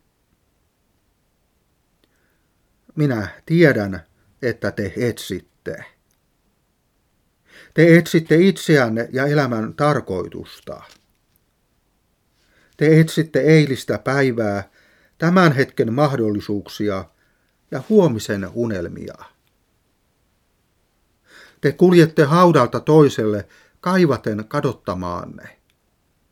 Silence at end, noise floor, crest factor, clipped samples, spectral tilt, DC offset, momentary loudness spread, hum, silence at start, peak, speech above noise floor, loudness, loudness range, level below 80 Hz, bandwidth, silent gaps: 0.85 s; -65 dBFS; 20 dB; under 0.1%; -7 dB/octave; under 0.1%; 18 LU; none; 2.95 s; 0 dBFS; 48 dB; -18 LUFS; 11 LU; -58 dBFS; 15.5 kHz; none